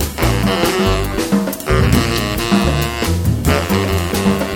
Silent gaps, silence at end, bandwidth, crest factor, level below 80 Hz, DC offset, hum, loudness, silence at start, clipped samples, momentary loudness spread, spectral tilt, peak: none; 0 s; 19.5 kHz; 16 dB; -24 dBFS; under 0.1%; none; -16 LUFS; 0 s; under 0.1%; 3 LU; -5 dB/octave; 0 dBFS